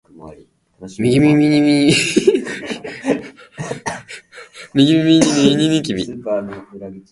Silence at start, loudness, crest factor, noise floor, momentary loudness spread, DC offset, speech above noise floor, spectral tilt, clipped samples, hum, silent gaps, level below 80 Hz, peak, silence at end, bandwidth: 0.2 s; -15 LUFS; 16 dB; -46 dBFS; 22 LU; under 0.1%; 32 dB; -5 dB/octave; under 0.1%; none; none; -50 dBFS; 0 dBFS; 0.1 s; 11.5 kHz